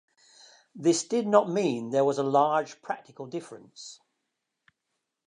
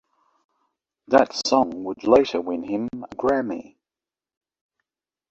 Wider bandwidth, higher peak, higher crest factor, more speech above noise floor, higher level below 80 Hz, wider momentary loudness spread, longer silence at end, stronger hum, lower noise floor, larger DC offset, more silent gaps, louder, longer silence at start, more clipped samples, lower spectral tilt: first, 11 kHz vs 8 kHz; second, -6 dBFS vs -2 dBFS; about the same, 22 dB vs 22 dB; second, 56 dB vs over 69 dB; second, -82 dBFS vs -60 dBFS; first, 21 LU vs 11 LU; second, 1.35 s vs 1.7 s; neither; second, -82 dBFS vs under -90 dBFS; neither; neither; second, -27 LUFS vs -22 LUFS; second, 0.75 s vs 1.1 s; neither; about the same, -5 dB/octave vs -4.5 dB/octave